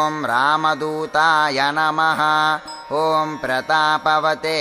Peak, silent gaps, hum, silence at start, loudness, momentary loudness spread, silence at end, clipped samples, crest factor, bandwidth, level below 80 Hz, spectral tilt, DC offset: -2 dBFS; none; none; 0 s; -18 LUFS; 6 LU; 0 s; under 0.1%; 16 dB; 16 kHz; -60 dBFS; -3.5 dB/octave; under 0.1%